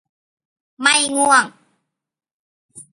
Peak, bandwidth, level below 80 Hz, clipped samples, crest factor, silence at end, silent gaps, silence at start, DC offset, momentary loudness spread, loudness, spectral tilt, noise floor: 0 dBFS; 11.5 kHz; -70 dBFS; under 0.1%; 22 dB; 0.15 s; 2.33-2.69 s; 0.8 s; under 0.1%; 6 LU; -15 LUFS; 0 dB/octave; -71 dBFS